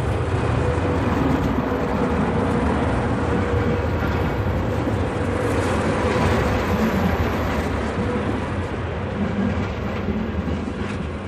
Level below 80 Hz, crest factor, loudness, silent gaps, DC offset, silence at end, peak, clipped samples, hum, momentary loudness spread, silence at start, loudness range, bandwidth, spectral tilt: -30 dBFS; 14 dB; -22 LUFS; none; 0.2%; 0 s; -8 dBFS; under 0.1%; none; 5 LU; 0 s; 3 LU; 14 kHz; -7 dB/octave